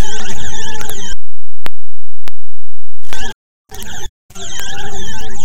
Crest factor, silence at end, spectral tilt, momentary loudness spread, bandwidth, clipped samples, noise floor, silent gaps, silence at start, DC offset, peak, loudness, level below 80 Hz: 8 dB; 0 s; -3 dB/octave; 10 LU; 17.5 kHz; 40%; under -90 dBFS; 3.35-3.65 s, 4.09-4.29 s; 0 s; under 0.1%; 0 dBFS; -28 LUFS; -30 dBFS